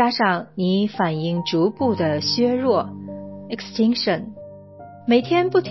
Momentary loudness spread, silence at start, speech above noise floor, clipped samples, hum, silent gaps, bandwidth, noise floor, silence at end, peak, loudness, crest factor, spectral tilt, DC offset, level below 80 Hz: 16 LU; 0 s; 21 dB; under 0.1%; none; none; 6 kHz; -41 dBFS; 0 s; -6 dBFS; -21 LUFS; 16 dB; -6 dB/octave; 0.1%; -56 dBFS